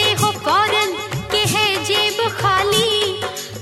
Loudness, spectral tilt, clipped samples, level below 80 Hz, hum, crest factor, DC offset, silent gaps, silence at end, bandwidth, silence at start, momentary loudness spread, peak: -17 LUFS; -2.5 dB/octave; under 0.1%; -48 dBFS; none; 14 dB; under 0.1%; none; 0 s; 16 kHz; 0 s; 6 LU; -4 dBFS